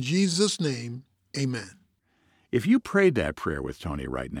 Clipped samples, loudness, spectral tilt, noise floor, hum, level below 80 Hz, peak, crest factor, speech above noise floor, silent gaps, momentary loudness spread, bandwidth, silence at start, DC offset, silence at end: under 0.1%; -26 LUFS; -5 dB/octave; -68 dBFS; none; -48 dBFS; -10 dBFS; 18 dB; 42 dB; none; 14 LU; 15.5 kHz; 0 s; under 0.1%; 0 s